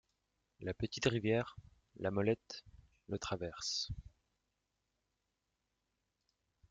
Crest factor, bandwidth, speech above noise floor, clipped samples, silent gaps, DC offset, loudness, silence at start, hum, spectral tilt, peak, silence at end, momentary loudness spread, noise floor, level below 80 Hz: 24 dB; 9.4 kHz; 48 dB; under 0.1%; none; under 0.1%; -39 LUFS; 0.6 s; none; -4.5 dB/octave; -18 dBFS; 2.65 s; 13 LU; -86 dBFS; -62 dBFS